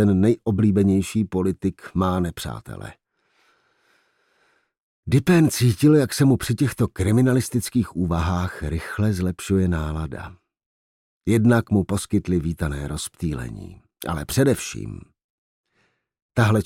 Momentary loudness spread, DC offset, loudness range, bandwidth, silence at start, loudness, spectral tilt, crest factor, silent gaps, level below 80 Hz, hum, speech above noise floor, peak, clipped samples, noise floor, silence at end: 16 LU; under 0.1%; 8 LU; 16.5 kHz; 0 s; -22 LUFS; -6.5 dB/octave; 16 dB; 4.80-5.03 s, 10.66-11.20 s, 15.24-15.64 s, 16.22-16.29 s; -44 dBFS; none; 47 dB; -6 dBFS; under 0.1%; -68 dBFS; 0 s